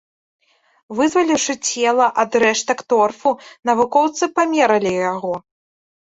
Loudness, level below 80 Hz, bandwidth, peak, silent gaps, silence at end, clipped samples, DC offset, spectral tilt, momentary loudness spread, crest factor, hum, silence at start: -17 LUFS; -62 dBFS; 8.4 kHz; -2 dBFS; none; 0.75 s; under 0.1%; under 0.1%; -3 dB/octave; 7 LU; 16 dB; none; 0.9 s